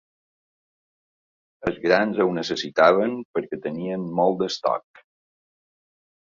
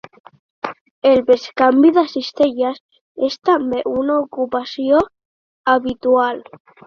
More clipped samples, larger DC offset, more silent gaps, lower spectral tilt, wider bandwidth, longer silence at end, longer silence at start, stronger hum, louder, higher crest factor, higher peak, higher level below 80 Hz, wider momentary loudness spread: neither; neither; second, 3.25-3.34 s vs 0.81-1.02 s, 2.80-2.89 s, 3.01-3.15 s, 5.25-5.64 s; about the same, -5.5 dB/octave vs -5.5 dB/octave; first, 7.6 kHz vs 6.8 kHz; first, 1.5 s vs 0.45 s; first, 1.6 s vs 0.65 s; neither; second, -23 LUFS vs -17 LUFS; first, 22 dB vs 16 dB; about the same, -2 dBFS vs -2 dBFS; about the same, -60 dBFS vs -56 dBFS; about the same, 12 LU vs 14 LU